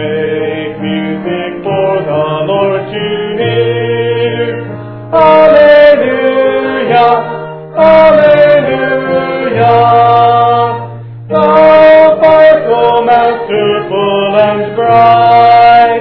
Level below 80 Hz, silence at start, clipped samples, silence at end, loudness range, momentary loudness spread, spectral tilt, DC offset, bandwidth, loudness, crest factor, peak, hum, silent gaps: -42 dBFS; 0 s; 3%; 0 s; 6 LU; 12 LU; -8.5 dB/octave; under 0.1%; 5.4 kHz; -8 LUFS; 8 dB; 0 dBFS; none; none